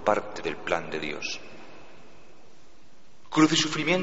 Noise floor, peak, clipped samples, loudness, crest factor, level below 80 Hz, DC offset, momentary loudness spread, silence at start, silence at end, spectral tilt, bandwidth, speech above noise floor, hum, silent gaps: -58 dBFS; -6 dBFS; under 0.1%; -27 LUFS; 22 dB; -60 dBFS; 1%; 23 LU; 0 s; 0 s; -3 dB/octave; 8 kHz; 32 dB; none; none